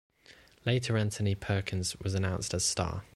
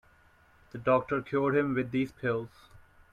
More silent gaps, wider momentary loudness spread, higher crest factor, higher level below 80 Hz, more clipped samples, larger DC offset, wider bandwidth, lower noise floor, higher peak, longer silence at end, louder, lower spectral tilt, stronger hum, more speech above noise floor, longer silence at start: neither; second, 4 LU vs 8 LU; about the same, 20 dB vs 18 dB; first, -52 dBFS vs -62 dBFS; neither; neither; first, 13 kHz vs 10.5 kHz; about the same, -59 dBFS vs -62 dBFS; about the same, -14 dBFS vs -14 dBFS; second, 0.1 s vs 0.35 s; about the same, -31 LUFS vs -30 LUFS; second, -4.5 dB/octave vs -8.5 dB/octave; neither; second, 28 dB vs 32 dB; second, 0.3 s vs 0.75 s